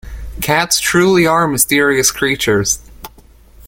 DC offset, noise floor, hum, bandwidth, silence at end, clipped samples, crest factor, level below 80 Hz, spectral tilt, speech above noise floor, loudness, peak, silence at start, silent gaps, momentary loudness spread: under 0.1%; -43 dBFS; none; 17 kHz; 0 s; under 0.1%; 14 dB; -36 dBFS; -3 dB/octave; 30 dB; -13 LUFS; 0 dBFS; 0.05 s; none; 7 LU